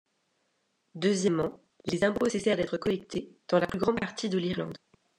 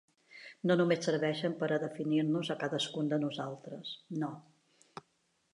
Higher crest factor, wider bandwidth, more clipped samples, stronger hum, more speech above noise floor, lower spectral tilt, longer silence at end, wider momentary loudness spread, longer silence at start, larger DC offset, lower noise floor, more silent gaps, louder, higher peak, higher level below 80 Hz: about the same, 20 dB vs 18 dB; about the same, 12 kHz vs 11 kHz; neither; neither; first, 47 dB vs 43 dB; about the same, -5.5 dB/octave vs -6 dB/octave; second, 0.4 s vs 0.55 s; second, 11 LU vs 22 LU; first, 0.95 s vs 0.3 s; neither; about the same, -76 dBFS vs -76 dBFS; neither; first, -29 LUFS vs -34 LUFS; first, -10 dBFS vs -16 dBFS; first, -62 dBFS vs -84 dBFS